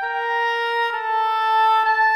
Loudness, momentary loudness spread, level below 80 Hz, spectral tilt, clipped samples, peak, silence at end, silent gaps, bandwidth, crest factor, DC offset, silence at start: -19 LUFS; 5 LU; -74 dBFS; 1 dB/octave; under 0.1%; -8 dBFS; 0 s; none; 14 kHz; 10 dB; under 0.1%; 0 s